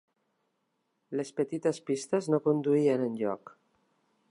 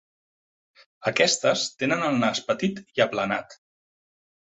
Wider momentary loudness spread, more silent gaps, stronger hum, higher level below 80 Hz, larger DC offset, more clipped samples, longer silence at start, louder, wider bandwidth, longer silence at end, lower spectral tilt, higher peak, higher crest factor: first, 10 LU vs 7 LU; neither; neither; second, -84 dBFS vs -66 dBFS; neither; neither; about the same, 1.1 s vs 1 s; second, -30 LUFS vs -24 LUFS; first, 11 kHz vs 8.4 kHz; second, 0.8 s vs 1.05 s; first, -6.5 dB/octave vs -3.5 dB/octave; second, -14 dBFS vs -4 dBFS; about the same, 18 dB vs 22 dB